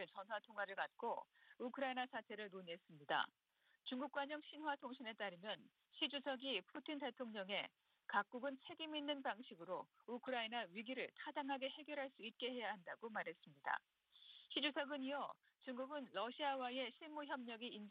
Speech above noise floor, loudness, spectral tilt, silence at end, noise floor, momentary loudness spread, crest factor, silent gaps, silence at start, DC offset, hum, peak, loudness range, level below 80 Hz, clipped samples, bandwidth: 19 dB; -47 LUFS; -5.5 dB/octave; 0 s; -66 dBFS; 9 LU; 22 dB; none; 0 s; under 0.1%; none; -26 dBFS; 2 LU; under -90 dBFS; under 0.1%; 5.6 kHz